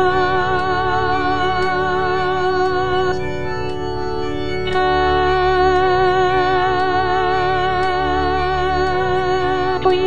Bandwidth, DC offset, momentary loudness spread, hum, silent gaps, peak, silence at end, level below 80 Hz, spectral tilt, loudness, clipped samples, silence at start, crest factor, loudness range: 9.4 kHz; 4%; 8 LU; none; none; -4 dBFS; 0 s; -34 dBFS; -6 dB/octave; -17 LUFS; under 0.1%; 0 s; 14 dB; 3 LU